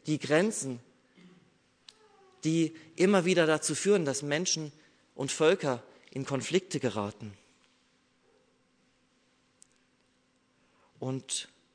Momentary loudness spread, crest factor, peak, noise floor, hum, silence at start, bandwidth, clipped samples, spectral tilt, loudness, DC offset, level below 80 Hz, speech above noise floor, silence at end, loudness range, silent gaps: 14 LU; 20 dB; -12 dBFS; -70 dBFS; none; 0.05 s; 11 kHz; under 0.1%; -4 dB/octave; -30 LUFS; under 0.1%; -78 dBFS; 41 dB; 0.3 s; 14 LU; none